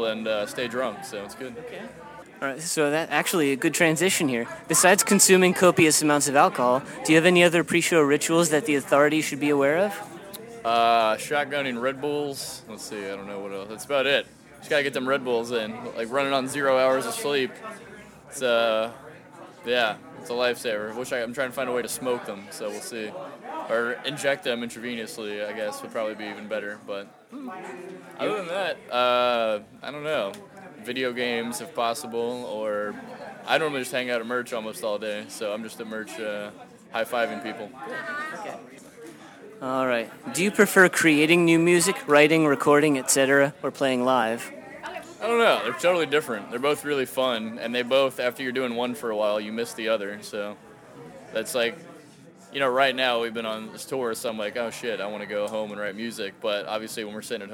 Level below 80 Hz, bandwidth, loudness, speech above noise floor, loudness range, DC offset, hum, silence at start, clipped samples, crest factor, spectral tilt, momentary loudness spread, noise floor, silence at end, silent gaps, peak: -68 dBFS; over 20 kHz; -24 LUFS; 25 dB; 11 LU; under 0.1%; none; 0 s; under 0.1%; 22 dB; -3.5 dB/octave; 18 LU; -49 dBFS; 0 s; none; -2 dBFS